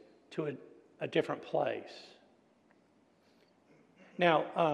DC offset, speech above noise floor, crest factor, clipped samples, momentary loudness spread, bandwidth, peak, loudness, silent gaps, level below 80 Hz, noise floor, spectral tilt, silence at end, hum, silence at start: under 0.1%; 36 dB; 24 dB; under 0.1%; 22 LU; 10.5 kHz; -14 dBFS; -34 LUFS; none; -88 dBFS; -68 dBFS; -6.5 dB/octave; 0 s; none; 0.3 s